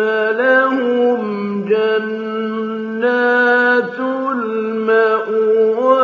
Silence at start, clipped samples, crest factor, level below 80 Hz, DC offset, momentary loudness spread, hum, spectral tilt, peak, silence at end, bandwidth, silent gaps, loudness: 0 s; under 0.1%; 14 dB; -70 dBFS; under 0.1%; 9 LU; none; -3 dB/octave; -2 dBFS; 0 s; 6.4 kHz; none; -16 LUFS